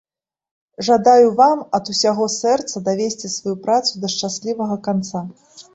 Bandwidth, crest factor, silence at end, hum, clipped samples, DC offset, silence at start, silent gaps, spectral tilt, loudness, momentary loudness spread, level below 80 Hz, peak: 8.2 kHz; 16 dB; 0.1 s; none; under 0.1%; under 0.1%; 0.8 s; none; -4 dB/octave; -18 LUFS; 12 LU; -62 dBFS; -2 dBFS